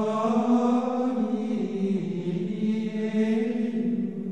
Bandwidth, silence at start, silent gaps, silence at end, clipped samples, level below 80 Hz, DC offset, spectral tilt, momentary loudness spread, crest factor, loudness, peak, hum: 8.6 kHz; 0 s; none; 0 s; under 0.1%; -80 dBFS; 0.3%; -8 dB/octave; 6 LU; 14 dB; -26 LUFS; -12 dBFS; none